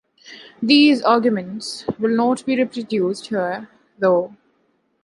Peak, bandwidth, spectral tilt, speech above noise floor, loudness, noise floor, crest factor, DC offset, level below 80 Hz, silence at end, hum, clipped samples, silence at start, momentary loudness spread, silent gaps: -2 dBFS; 11.5 kHz; -5 dB/octave; 47 dB; -19 LUFS; -65 dBFS; 18 dB; under 0.1%; -66 dBFS; 0.7 s; none; under 0.1%; 0.3 s; 14 LU; none